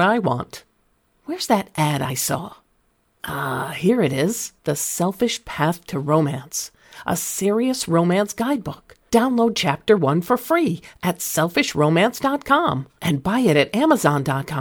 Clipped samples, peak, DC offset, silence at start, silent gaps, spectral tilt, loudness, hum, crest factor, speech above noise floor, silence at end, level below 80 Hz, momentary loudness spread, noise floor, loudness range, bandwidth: under 0.1%; -2 dBFS; under 0.1%; 0 s; none; -5 dB/octave; -20 LUFS; none; 18 dB; 44 dB; 0 s; -54 dBFS; 11 LU; -64 dBFS; 4 LU; 19.5 kHz